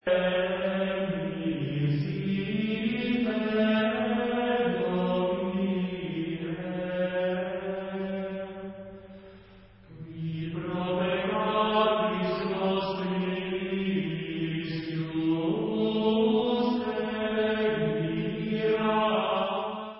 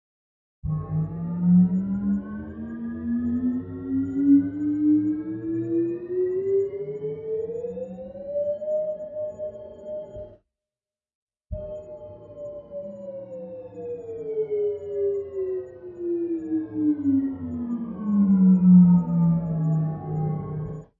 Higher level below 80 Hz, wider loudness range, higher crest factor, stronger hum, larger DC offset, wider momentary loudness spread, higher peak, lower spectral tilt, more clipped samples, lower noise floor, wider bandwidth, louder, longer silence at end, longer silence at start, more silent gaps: second, -58 dBFS vs -52 dBFS; second, 6 LU vs 17 LU; about the same, 16 dB vs 18 dB; neither; neither; second, 8 LU vs 18 LU; second, -12 dBFS vs -6 dBFS; second, -10.5 dB/octave vs -13 dB/octave; neither; second, -53 dBFS vs under -90 dBFS; first, 5.8 kHz vs 2.3 kHz; second, -28 LUFS vs -24 LUFS; second, 0 s vs 0.15 s; second, 0.05 s vs 0.65 s; second, none vs 11.15-11.27 s